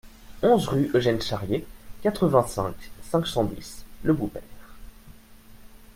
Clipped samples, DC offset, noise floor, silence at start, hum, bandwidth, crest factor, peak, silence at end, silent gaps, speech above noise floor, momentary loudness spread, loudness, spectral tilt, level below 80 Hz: under 0.1%; under 0.1%; -48 dBFS; 0.05 s; none; 16.5 kHz; 22 dB; -4 dBFS; 0.05 s; none; 24 dB; 12 LU; -25 LUFS; -6 dB/octave; -46 dBFS